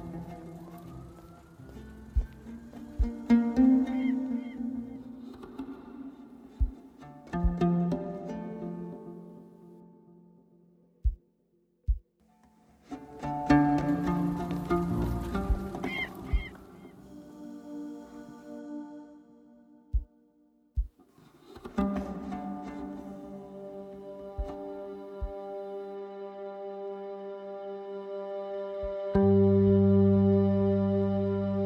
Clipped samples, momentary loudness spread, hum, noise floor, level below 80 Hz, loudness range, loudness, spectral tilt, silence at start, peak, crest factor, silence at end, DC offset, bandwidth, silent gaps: under 0.1%; 23 LU; none; -71 dBFS; -40 dBFS; 15 LU; -30 LUFS; -9 dB/octave; 0 s; -12 dBFS; 20 dB; 0 s; under 0.1%; 8.4 kHz; none